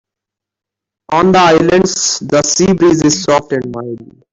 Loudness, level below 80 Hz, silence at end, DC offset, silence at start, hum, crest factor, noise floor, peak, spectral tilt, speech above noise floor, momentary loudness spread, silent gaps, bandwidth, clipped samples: -11 LUFS; -44 dBFS; 0.3 s; under 0.1%; 1.1 s; none; 12 dB; -83 dBFS; 0 dBFS; -4 dB/octave; 72 dB; 14 LU; none; 8 kHz; under 0.1%